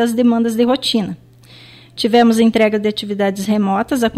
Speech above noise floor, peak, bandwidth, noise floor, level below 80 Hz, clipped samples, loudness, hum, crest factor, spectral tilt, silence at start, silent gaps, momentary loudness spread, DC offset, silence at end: 28 dB; -2 dBFS; 14.5 kHz; -42 dBFS; -50 dBFS; under 0.1%; -15 LUFS; none; 14 dB; -5 dB/octave; 0 s; none; 9 LU; under 0.1%; 0 s